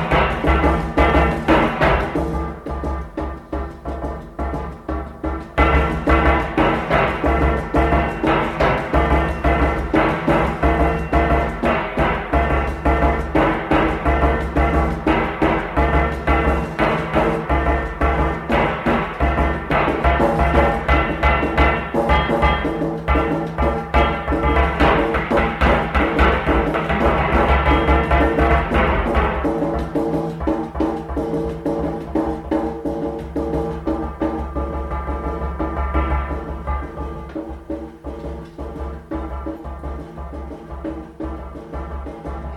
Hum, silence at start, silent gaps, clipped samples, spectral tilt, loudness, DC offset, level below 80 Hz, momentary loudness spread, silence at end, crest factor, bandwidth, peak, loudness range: none; 0 s; none; under 0.1%; -7.5 dB/octave; -19 LUFS; under 0.1%; -24 dBFS; 14 LU; 0 s; 16 dB; 10 kHz; -2 dBFS; 10 LU